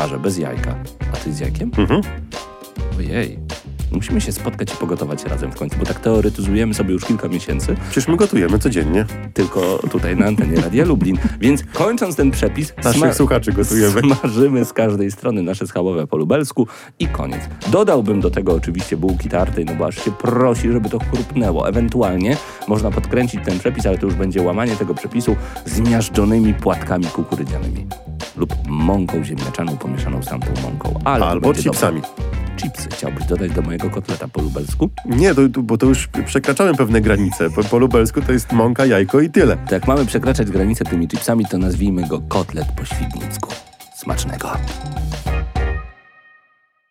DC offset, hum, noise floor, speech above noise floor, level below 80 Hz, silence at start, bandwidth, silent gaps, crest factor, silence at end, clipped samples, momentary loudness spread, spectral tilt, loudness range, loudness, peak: under 0.1%; none; -59 dBFS; 42 dB; -28 dBFS; 0 s; 16.5 kHz; none; 16 dB; 1 s; under 0.1%; 10 LU; -6 dB/octave; 7 LU; -18 LUFS; -2 dBFS